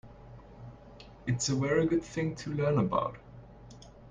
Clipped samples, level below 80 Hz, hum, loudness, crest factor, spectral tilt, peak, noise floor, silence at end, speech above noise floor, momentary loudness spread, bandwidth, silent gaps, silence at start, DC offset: under 0.1%; -56 dBFS; none; -31 LUFS; 18 dB; -5.5 dB/octave; -14 dBFS; -51 dBFS; 0 s; 22 dB; 24 LU; 9.6 kHz; none; 0.05 s; under 0.1%